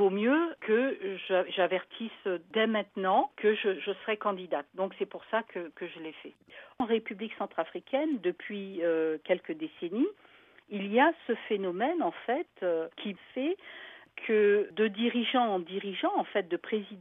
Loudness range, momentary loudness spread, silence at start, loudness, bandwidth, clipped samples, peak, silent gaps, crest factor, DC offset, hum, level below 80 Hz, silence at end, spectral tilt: 5 LU; 12 LU; 0 s; -31 LUFS; 3.9 kHz; under 0.1%; -12 dBFS; none; 20 dB; under 0.1%; none; -82 dBFS; 0 s; -8 dB/octave